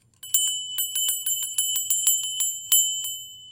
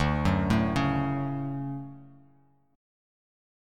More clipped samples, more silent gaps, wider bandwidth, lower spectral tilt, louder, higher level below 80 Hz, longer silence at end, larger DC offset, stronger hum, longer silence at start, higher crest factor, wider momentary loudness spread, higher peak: neither; neither; first, 17 kHz vs 12 kHz; second, 4.5 dB/octave vs -7.5 dB/octave; first, -22 LUFS vs -28 LUFS; second, -74 dBFS vs -42 dBFS; second, 0 s vs 1.6 s; neither; neither; first, 0.25 s vs 0 s; about the same, 20 dB vs 18 dB; second, 7 LU vs 12 LU; first, -6 dBFS vs -12 dBFS